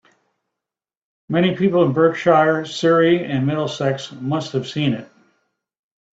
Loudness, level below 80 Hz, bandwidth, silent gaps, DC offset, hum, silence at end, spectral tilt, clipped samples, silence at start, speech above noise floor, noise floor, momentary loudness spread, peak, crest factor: -18 LUFS; -62 dBFS; 8 kHz; none; under 0.1%; none; 1.1 s; -6.5 dB/octave; under 0.1%; 1.3 s; 69 dB; -87 dBFS; 9 LU; -2 dBFS; 18 dB